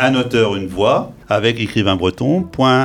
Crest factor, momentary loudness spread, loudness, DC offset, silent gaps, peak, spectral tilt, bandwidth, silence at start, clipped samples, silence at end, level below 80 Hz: 16 dB; 3 LU; -16 LUFS; under 0.1%; none; 0 dBFS; -6 dB/octave; 13 kHz; 0 s; under 0.1%; 0 s; -44 dBFS